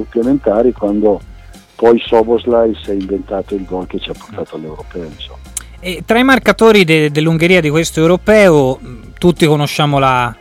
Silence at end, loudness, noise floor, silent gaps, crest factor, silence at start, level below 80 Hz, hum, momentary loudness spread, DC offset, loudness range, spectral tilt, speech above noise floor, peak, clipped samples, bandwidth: 0.05 s; -12 LUFS; -36 dBFS; none; 12 dB; 0 s; -36 dBFS; none; 18 LU; under 0.1%; 9 LU; -5.5 dB/octave; 24 dB; 0 dBFS; under 0.1%; 17 kHz